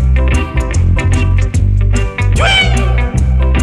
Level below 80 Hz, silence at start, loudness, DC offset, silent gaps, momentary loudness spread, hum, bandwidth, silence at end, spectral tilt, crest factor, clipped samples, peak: -14 dBFS; 0 s; -12 LUFS; under 0.1%; none; 5 LU; none; 11 kHz; 0 s; -5 dB/octave; 10 dB; under 0.1%; 0 dBFS